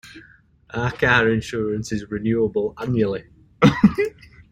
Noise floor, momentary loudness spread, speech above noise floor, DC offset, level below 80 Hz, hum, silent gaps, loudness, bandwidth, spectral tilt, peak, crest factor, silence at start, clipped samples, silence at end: -52 dBFS; 11 LU; 32 dB; under 0.1%; -46 dBFS; none; none; -20 LUFS; 12 kHz; -6.5 dB/octave; -2 dBFS; 20 dB; 0.05 s; under 0.1%; 0.1 s